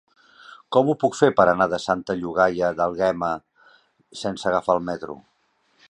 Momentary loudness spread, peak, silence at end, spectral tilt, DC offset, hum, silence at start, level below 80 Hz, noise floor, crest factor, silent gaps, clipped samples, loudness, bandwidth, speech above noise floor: 14 LU; -2 dBFS; 0.75 s; -5.5 dB/octave; under 0.1%; none; 0.5 s; -56 dBFS; -66 dBFS; 22 dB; none; under 0.1%; -22 LUFS; 10.5 kHz; 45 dB